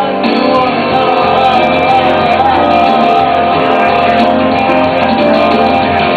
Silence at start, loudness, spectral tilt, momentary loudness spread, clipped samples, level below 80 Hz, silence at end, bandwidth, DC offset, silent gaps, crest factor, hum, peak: 0 s; -9 LUFS; -6.5 dB/octave; 2 LU; under 0.1%; -40 dBFS; 0 s; 8.6 kHz; under 0.1%; none; 8 dB; none; 0 dBFS